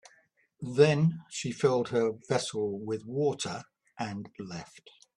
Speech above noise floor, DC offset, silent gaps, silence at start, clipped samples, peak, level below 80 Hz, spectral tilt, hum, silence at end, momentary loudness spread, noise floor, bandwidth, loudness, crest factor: 37 dB; under 0.1%; none; 0.6 s; under 0.1%; -8 dBFS; -70 dBFS; -5.5 dB/octave; none; 0.5 s; 17 LU; -67 dBFS; 11 kHz; -30 LUFS; 22 dB